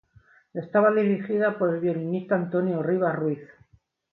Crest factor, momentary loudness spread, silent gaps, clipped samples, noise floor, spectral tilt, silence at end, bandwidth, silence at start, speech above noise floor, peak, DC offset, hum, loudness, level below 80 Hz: 16 dB; 9 LU; none; under 0.1%; -63 dBFS; -11 dB/octave; 0.65 s; 4.3 kHz; 0.55 s; 39 dB; -8 dBFS; under 0.1%; none; -25 LUFS; -70 dBFS